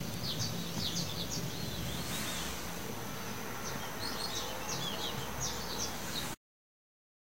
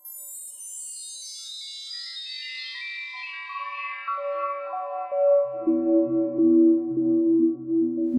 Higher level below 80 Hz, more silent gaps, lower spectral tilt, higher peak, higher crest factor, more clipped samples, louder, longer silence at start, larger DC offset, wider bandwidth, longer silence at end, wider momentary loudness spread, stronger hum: first, -54 dBFS vs -80 dBFS; neither; about the same, -3 dB/octave vs -4 dB/octave; second, -20 dBFS vs -10 dBFS; about the same, 18 dB vs 14 dB; neither; second, -37 LUFS vs -25 LUFS; about the same, 0 s vs 0.05 s; first, 0.6% vs under 0.1%; about the same, 16 kHz vs 15 kHz; first, 0.95 s vs 0 s; second, 5 LU vs 14 LU; neither